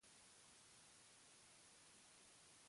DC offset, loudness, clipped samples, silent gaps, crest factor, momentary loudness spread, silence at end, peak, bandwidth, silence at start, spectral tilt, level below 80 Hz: under 0.1%; -66 LUFS; under 0.1%; none; 14 dB; 0 LU; 0 s; -54 dBFS; 11.5 kHz; 0 s; -1 dB/octave; under -90 dBFS